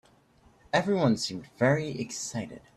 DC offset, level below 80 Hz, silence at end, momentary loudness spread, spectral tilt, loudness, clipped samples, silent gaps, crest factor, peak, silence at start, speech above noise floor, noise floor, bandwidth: under 0.1%; -64 dBFS; 0.2 s; 9 LU; -5 dB/octave; -28 LUFS; under 0.1%; none; 18 dB; -10 dBFS; 0.75 s; 33 dB; -61 dBFS; 13.5 kHz